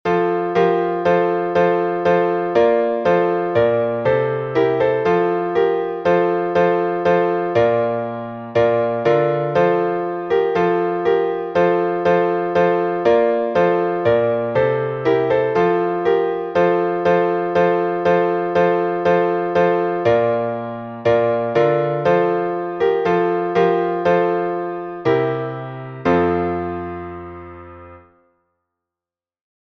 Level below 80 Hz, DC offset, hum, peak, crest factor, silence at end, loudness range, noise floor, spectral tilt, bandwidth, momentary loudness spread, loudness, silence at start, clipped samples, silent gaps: -54 dBFS; under 0.1%; none; -2 dBFS; 16 dB; 1.8 s; 3 LU; -90 dBFS; -8 dB/octave; 6.2 kHz; 6 LU; -18 LUFS; 0.05 s; under 0.1%; none